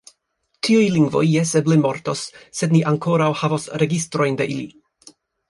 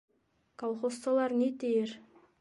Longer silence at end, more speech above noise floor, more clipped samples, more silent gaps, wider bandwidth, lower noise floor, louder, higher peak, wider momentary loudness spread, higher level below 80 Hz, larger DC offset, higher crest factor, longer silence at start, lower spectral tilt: first, 0.8 s vs 0.4 s; first, 52 dB vs 32 dB; neither; neither; about the same, 11.5 kHz vs 11.5 kHz; first, -70 dBFS vs -63 dBFS; first, -19 LUFS vs -32 LUFS; first, -4 dBFS vs -18 dBFS; about the same, 10 LU vs 11 LU; first, -60 dBFS vs -82 dBFS; neither; about the same, 16 dB vs 14 dB; about the same, 0.65 s vs 0.6 s; about the same, -6 dB/octave vs -5 dB/octave